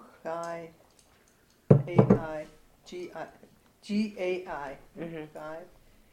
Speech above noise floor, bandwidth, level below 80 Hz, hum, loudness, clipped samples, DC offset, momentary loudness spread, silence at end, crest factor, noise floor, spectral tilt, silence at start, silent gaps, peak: 33 dB; 10.5 kHz; -56 dBFS; none; -29 LUFS; under 0.1%; under 0.1%; 22 LU; 0.45 s; 28 dB; -63 dBFS; -8.5 dB/octave; 0 s; none; -4 dBFS